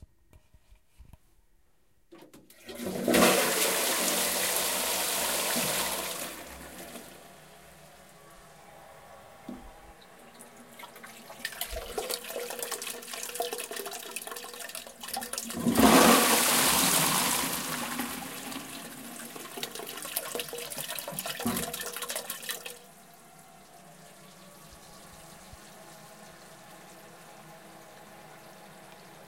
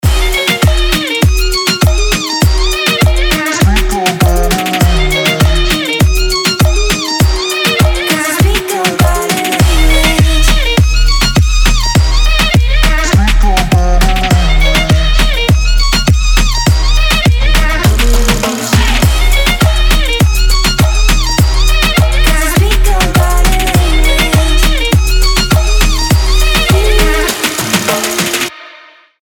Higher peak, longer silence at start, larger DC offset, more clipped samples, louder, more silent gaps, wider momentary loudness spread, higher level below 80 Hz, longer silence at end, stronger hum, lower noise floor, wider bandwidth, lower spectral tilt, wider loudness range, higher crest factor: second, -6 dBFS vs 0 dBFS; first, 1 s vs 0.05 s; neither; neither; second, -28 LUFS vs -10 LUFS; neither; first, 27 LU vs 2 LU; second, -58 dBFS vs -12 dBFS; second, 0 s vs 0.45 s; neither; first, -70 dBFS vs -38 dBFS; second, 17 kHz vs 19 kHz; second, -2 dB/octave vs -4 dB/octave; first, 26 LU vs 1 LU; first, 26 dB vs 8 dB